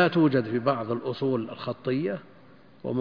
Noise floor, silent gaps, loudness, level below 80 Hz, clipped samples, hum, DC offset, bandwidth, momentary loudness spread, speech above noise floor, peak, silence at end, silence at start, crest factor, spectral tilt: -54 dBFS; none; -27 LUFS; -68 dBFS; under 0.1%; none; 0.1%; 5.2 kHz; 11 LU; 28 dB; -8 dBFS; 0 s; 0 s; 20 dB; -9 dB/octave